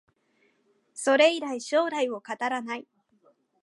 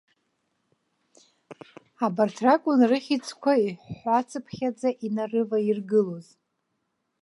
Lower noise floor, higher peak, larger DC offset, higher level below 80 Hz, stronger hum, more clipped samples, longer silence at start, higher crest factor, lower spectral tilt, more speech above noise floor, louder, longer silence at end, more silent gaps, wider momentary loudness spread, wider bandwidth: second, -69 dBFS vs -77 dBFS; about the same, -6 dBFS vs -6 dBFS; neither; second, -86 dBFS vs -72 dBFS; neither; neither; second, 0.95 s vs 1.5 s; about the same, 22 dB vs 20 dB; second, -2 dB/octave vs -6 dB/octave; second, 43 dB vs 52 dB; about the same, -26 LUFS vs -25 LUFS; second, 0.8 s vs 1 s; neither; first, 15 LU vs 10 LU; about the same, 11.5 kHz vs 11.5 kHz